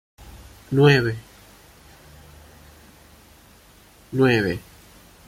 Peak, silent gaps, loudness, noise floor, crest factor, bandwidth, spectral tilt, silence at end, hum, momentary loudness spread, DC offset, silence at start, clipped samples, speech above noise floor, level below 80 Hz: -2 dBFS; none; -20 LUFS; -51 dBFS; 22 dB; 16 kHz; -6.5 dB/octave; 0.7 s; none; 18 LU; under 0.1%; 0.35 s; under 0.1%; 33 dB; -50 dBFS